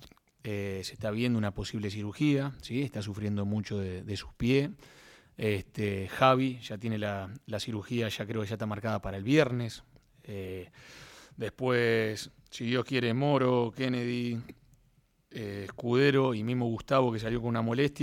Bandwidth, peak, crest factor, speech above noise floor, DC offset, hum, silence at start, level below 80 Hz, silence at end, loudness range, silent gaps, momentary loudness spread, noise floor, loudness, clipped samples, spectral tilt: 16 kHz; -8 dBFS; 24 dB; 37 dB; under 0.1%; none; 0 s; -58 dBFS; 0 s; 3 LU; none; 14 LU; -68 dBFS; -31 LUFS; under 0.1%; -6.5 dB/octave